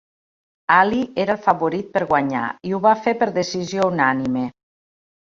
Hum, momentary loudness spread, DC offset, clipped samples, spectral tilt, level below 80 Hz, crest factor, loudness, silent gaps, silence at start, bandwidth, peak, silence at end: none; 9 LU; under 0.1%; under 0.1%; -5.5 dB/octave; -58 dBFS; 18 dB; -19 LUFS; none; 0.7 s; 7.6 kHz; -2 dBFS; 0.8 s